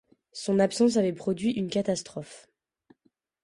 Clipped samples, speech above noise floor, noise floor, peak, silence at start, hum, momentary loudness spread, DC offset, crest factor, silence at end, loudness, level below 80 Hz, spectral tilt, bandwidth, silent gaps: under 0.1%; 45 dB; -71 dBFS; -10 dBFS; 0.35 s; none; 18 LU; under 0.1%; 18 dB; 1.05 s; -27 LUFS; -66 dBFS; -5.5 dB/octave; 11.5 kHz; none